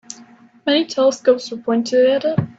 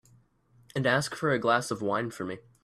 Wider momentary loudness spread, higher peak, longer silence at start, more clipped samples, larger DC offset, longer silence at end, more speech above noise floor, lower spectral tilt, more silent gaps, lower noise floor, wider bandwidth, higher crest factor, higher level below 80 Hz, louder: about the same, 11 LU vs 12 LU; first, -2 dBFS vs -10 dBFS; second, 0.1 s vs 0.75 s; neither; neither; second, 0.1 s vs 0.25 s; second, 29 dB vs 35 dB; about the same, -5 dB/octave vs -5 dB/octave; neither; second, -46 dBFS vs -63 dBFS; second, 8 kHz vs 14 kHz; about the same, 16 dB vs 20 dB; about the same, -62 dBFS vs -66 dBFS; first, -17 LUFS vs -29 LUFS